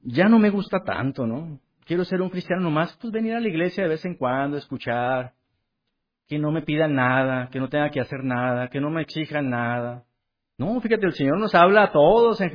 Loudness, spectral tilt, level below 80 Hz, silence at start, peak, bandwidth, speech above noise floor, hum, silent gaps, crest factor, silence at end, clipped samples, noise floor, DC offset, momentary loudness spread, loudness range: -22 LUFS; -8.5 dB/octave; -56 dBFS; 0.05 s; -4 dBFS; 5.2 kHz; 57 dB; none; none; 18 dB; 0 s; under 0.1%; -78 dBFS; under 0.1%; 12 LU; 5 LU